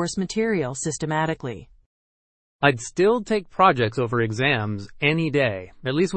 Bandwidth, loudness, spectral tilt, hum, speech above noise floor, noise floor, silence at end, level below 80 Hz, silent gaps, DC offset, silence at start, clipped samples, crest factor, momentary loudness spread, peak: 8.8 kHz; -22 LUFS; -5 dB/octave; none; over 68 dB; under -90 dBFS; 0 s; -52 dBFS; 1.86-2.59 s; under 0.1%; 0 s; under 0.1%; 22 dB; 9 LU; -2 dBFS